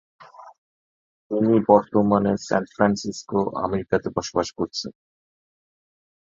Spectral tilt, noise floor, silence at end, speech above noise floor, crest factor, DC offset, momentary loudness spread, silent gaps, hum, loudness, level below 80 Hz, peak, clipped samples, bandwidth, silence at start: -6 dB/octave; under -90 dBFS; 1.3 s; over 68 dB; 22 dB; under 0.1%; 11 LU; 0.58-1.30 s; none; -22 LUFS; -54 dBFS; -2 dBFS; under 0.1%; 7.6 kHz; 0.2 s